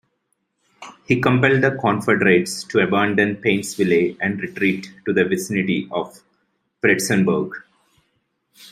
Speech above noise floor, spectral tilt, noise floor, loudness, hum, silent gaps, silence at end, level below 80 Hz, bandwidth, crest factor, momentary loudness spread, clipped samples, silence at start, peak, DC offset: 53 dB; -5.5 dB/octave; -71 dBFS; -19 LUFS; none; none; 0.05 s; -60 dBFS; 15.5 kHz; 18 dB; 10 LU; under 0.1%; 0.8 s; -2 dBFS; under 0.1%